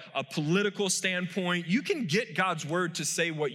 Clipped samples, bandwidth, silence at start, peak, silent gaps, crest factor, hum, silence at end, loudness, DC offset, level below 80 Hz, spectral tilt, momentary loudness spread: under 0.1%; 17 kHz; 0 s; -14 dBFS; none; 16 dB; none; 0 s; -29 LUFS; under 0.1%; -84 dBFS; -4 dB/octave; 3 LU